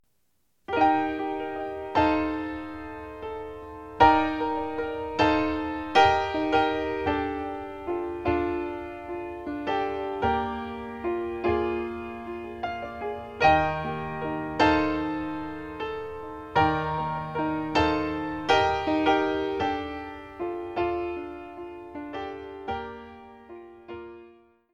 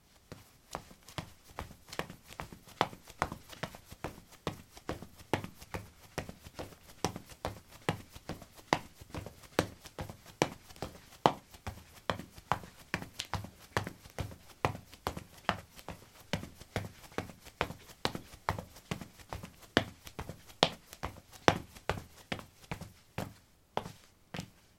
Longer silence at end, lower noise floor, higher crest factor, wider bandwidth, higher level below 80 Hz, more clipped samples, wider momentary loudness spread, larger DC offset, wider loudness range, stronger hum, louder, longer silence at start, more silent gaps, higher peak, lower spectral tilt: first, 0.4 s vs 0.25 s; first, -75 dBFS vs -57 dBFS; second, 22 dB vs 38 dB; second, 8 kHz vs 16.5 kHz; first, -48 dBFS vs -58 dBFS; neither; first, 17 LU vs 14 LU; neither; about the same, 8 LU vs 7 LU; neither; first, -27 LUFS vs -39 LUFS; first, 0.7 s vs 0.3 s; neither; second, -6 dBFS vs -2 dBFS; first, -6 dB/octave vs -4.5 dB/octave